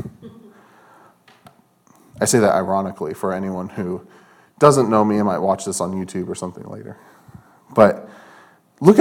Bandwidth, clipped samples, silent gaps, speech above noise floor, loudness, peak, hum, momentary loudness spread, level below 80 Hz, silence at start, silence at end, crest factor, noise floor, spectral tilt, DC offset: 17.5 kHz; under 0.1%; none; 36 dB; -19 LUFS; 0 dBFS; none; 18 LU; -60 dBFS; 0 s; 0 s; 20 dB; -55 dBFS; -5.5 dB/octave; under 0.1%